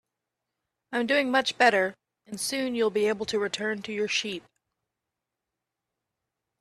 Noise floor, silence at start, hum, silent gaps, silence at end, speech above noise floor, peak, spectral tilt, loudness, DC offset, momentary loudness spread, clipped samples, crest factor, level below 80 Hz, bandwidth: -86 dBFS; 0.9 s; none; none; 2.2 s; 60 dB; -6 dBFS; -2.5 dB/octave; -26 LUFS; under 0.1%; 11 LU; under 0.1%; 22 dB; -72 dBFS; 14 kHz